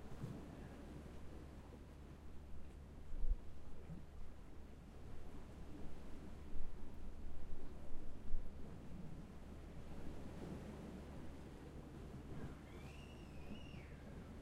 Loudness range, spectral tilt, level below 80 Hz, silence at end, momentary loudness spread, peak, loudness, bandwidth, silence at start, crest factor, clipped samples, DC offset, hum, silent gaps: 3 LU; -7 dB/octave; -50 dBFS; 0 s; 7 LU; -24 dBFS; -55 LUFS; 7 kHz; 0 s; 20 dB; under 0.1%; under 0.1%; none; none